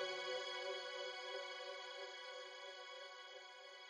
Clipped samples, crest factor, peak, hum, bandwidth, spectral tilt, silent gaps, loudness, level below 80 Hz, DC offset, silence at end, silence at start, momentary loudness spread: under 0.1%; 16 dB; -32 dBFS; none; 10 kHz; 0 dB/octave; none; -48 LUFS; under -90 dBFS; under 0.1%; 0 s; 0 s; 10 LU